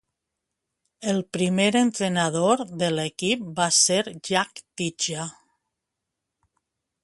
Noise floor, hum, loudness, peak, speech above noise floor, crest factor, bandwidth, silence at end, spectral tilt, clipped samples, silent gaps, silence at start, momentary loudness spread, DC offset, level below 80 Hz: -83 dBFS; none; -23 LUFS; -6 dBFS; 60 dB; 20 dB; 11.5 kHz; 1.7 s; -3.5 dB/octave; under 0.1%; none; 1 s; 12 LU; under 0.1%; -66 dBFS